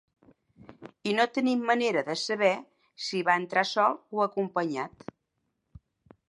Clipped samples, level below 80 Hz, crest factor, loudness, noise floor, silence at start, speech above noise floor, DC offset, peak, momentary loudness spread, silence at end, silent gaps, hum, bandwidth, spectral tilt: under 0.1%; -70 dBFS; 20 dB; -28 LUFS; -79 dBFS; 0.7 s; 52 dB; under 0.1%; -10 dBFS; 11 LU; 1.4 s; none; none; 11.5 kHz; -4.5 dB/octave